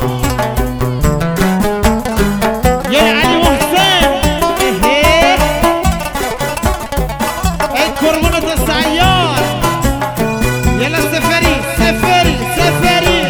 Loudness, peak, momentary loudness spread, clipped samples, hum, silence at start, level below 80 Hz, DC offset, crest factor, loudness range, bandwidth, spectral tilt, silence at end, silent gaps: -12 LUFS; 0 dBFS; 7 LU; under 0.1%; none; 0 s; -22 dBFS; under 0.1%; 12 dB; 3 LU; over 20 kHz; -4.5 dB/octave; 0 s; none